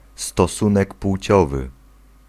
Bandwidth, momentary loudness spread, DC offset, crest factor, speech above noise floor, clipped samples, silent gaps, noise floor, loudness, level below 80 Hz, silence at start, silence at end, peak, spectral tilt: 14.5 kHz; 10 LU; under 0.1%; 18 dB; 31 dB; under 0.1%; none; -49 dBFS; -19 LUFS; -34 dBFS; 0.2 s; 0.55 s; -2 dBFS; -6 dB/octave